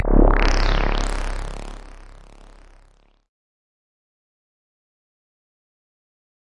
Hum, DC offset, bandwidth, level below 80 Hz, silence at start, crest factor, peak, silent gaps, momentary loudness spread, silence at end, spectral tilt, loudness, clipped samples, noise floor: none; under 0.1%; 10.5 kHz; -24 dBFS; 0 s; 20 dB; -2 dBFS; none; 22 LU; 4.5 s; -5.5 dB/octave; -22 LUFS; under 0.1%; -55 dBFS